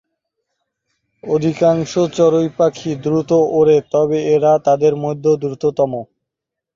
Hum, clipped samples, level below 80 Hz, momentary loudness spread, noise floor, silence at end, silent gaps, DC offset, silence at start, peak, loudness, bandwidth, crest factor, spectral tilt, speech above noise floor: none; under 0.1%; -56 dBFS; 6 LU; -82 dBFS; 0.7 s; none; under 0.1%; 1.25 s; -2 dBFS; -15 LUFS; 7.6 kHz; 14 dB; -7 dB/octave; 68 dB